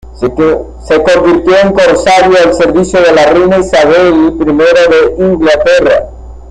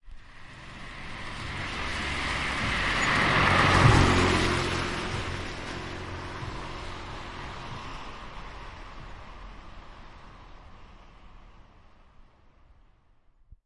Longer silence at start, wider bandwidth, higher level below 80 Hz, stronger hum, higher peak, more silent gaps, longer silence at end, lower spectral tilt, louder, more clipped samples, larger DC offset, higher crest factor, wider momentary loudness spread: about the same, 0.05 s vs 0.05 s; about the same, 10.5 kHz vs 11.5 kHz; first, -30 dBFS vs -40 dBFS; neither; first, 0 dBFS vs -6 dBFS; neither; about the same, 0 s vs 0.1 s; about the same, -5 dB/octave vs -4.5 dB/octave; first, -7 LUFS vs -26 LUFS; neither; neither; second, 6 dB vs 24 dB; second, 5 LU vs 25 LU